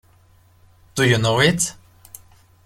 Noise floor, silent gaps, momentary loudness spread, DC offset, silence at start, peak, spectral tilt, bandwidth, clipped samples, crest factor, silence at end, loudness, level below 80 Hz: -54 dBFS; none; 8 LU; under 0.1%; 0.95 s; -2 dBFS; -4 dB/octave; 16 kHz; under 0.1%; 20 dB; 0.95 s; -18 LUFS; -50 dBFS